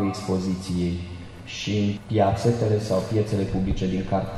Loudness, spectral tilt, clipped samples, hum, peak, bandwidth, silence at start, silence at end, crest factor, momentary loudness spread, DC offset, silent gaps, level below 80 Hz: -25 LUFS; -7 dB/octave; under 0.1%; none; -8 dBFS; 12.5 kHz; 0 s; 0 s; 18 dB; 10 LU; under 0.1%; none; -40 dBFS